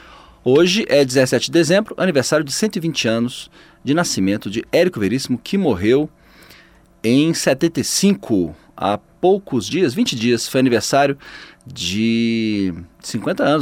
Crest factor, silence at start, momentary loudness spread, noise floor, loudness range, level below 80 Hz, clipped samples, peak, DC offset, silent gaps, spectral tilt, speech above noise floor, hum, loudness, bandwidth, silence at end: 16 dB; 0.45 s; 10 LU; -49 dBFS; 3 LU; -52 dBFS; under 0.1%; -2 dBFS; under 0.1%; none; -4.5 dB/octave; 31 dB; none; -18 LUFS; 16.5 kHz; 0 s